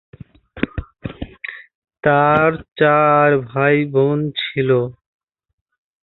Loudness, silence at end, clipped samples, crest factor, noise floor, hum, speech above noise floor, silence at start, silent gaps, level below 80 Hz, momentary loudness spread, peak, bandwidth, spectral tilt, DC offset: -16 LUFS; 1.1 s; under 0.1%; 16 dB; -39 dBFS; none; 24 dB; 0.55 s; 1.75-1.82 s, 2.72-2.76 s; -44 dBFS; 18 LU; -2 dBFS; 4.3 kHz; -10 dB/octave; under 0.1%